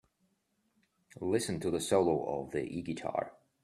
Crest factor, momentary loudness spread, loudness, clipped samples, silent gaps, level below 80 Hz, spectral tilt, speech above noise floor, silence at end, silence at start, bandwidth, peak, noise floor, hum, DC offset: 20 dB; 10 LU; -34 LUFS; under 0.1%; none; -66 dBFS; -5 dB/octave; 44 dB; 0.35 s; 1.15 s; 13.5 kHz; -14 dBFS; -77 dBFS; none; under 0.1%